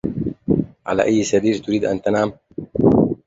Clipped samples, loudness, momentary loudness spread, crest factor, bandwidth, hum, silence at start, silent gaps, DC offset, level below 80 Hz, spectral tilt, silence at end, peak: under 0.1%; -19 LUFS; 9 LU; 16 dB; 7.8 kHz; none; 0.05 s; none; under 0.1%; -44 dBFS; -6.5 dB/octave; 0.1 s; -2 dBFS